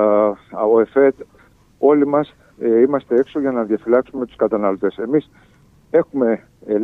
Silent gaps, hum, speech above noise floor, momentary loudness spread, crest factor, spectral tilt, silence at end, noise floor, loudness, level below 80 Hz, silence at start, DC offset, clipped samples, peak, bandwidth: none; none; 31 dB; 7 LU; 16 dB; -9 dB/octave; 0 s; -49 dBFS; -18 LUFS; -58 dBFS; 0 s; under 0.1%; under 0.1%; -2 dBFS; 4 kHz